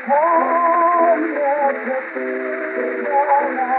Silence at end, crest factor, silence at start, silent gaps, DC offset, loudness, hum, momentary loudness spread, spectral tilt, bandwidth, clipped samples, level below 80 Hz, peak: 0 s; 14 dB; 0 s; none; under 0.1%; -18 LUFS; none; 9 LU; -3 dB/octave; 4.3 kHz; under 0.1%; under -90 dBFS; -4 dBFS